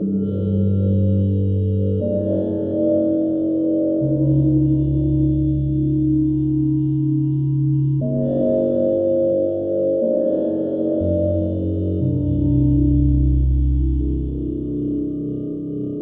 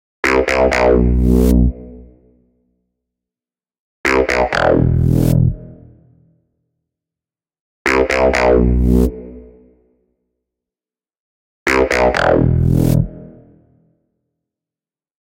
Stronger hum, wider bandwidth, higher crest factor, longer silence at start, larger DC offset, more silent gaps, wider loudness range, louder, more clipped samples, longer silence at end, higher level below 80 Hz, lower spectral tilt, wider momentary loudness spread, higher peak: neither; second, 3.6 kHz vs 16 kHz; about the same, 12 dB vs 16 dB; second, 0 s vs 0.25 s; neither; second, none vs 3.79-4.04 s, 7.60-7.85 s, 11.20-11.66 s; about the same, 1 LU vs 3 LU; second, -19 LUFS vs -14 LUFS; neither; second, 0 s vs 1.95 s; about the same, -28 dBFS vs -24 dBFS; first, -14.5 dB/octave vs -7 dB/octave; about the same, 6 LU vs 8 LU; second, -6 dBFS vs 0 dBFS